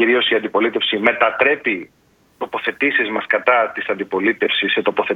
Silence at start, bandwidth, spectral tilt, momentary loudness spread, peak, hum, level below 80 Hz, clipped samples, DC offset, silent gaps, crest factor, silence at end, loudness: 0 s; 7 kHz; -5.5 dB/octave; 8 LU; 0 dBFS; none; -64 dBFS; under 0.1%; under 0.1%; none; 18 dB; 0 s; -17 LUFS